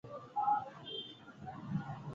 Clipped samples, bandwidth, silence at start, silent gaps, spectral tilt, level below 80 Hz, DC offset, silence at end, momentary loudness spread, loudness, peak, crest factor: under 0.1%; 7.4 kHz; 0.05 s; none; -4.5 dB/octave; -72 dBFS; under 0.1%; 0 s; 15 LU; -39 LUFS; -22 dBFS; 18 dB